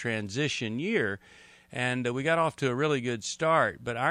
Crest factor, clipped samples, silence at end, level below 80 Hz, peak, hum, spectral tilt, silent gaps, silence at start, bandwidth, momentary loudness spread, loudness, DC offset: 18 dB; under 0.1%; 0 s; -66 dBFS; -10 dBFS; none; -4.5 dB/octave; none; 0 s; 12.5 kHz; 7 LU; -28 LUFS; under 0.1%